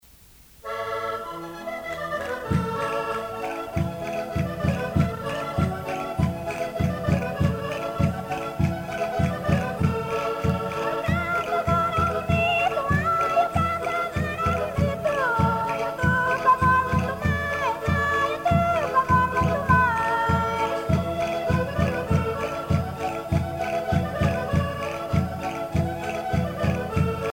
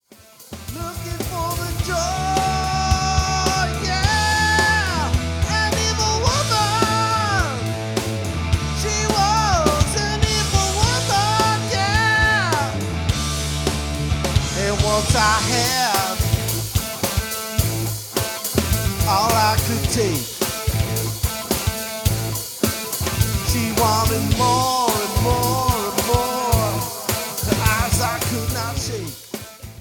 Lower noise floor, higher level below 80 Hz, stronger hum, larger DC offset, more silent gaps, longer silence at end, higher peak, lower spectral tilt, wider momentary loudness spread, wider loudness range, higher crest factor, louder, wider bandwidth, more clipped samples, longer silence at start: first, -51 dBFS vs -46 dBFS; second, -40 dBFS vs -30 dBFS; neither; neither; neither; about the same, 0 s vs 0 s; second, -6 dBFS vs -2 dBFS; first, -6.5 dB/octave vs -3.5 dB/octave; about the same, 8 LU vs 7 LU; about the same, 5 LU vs 3 LU; about the same, 18 dB vs 18 dB; second, -25 LUFS vs -20 LUFS; second, 17 kHz vs over 20 kHz; neither; first, 0.65 s vs 0.4 s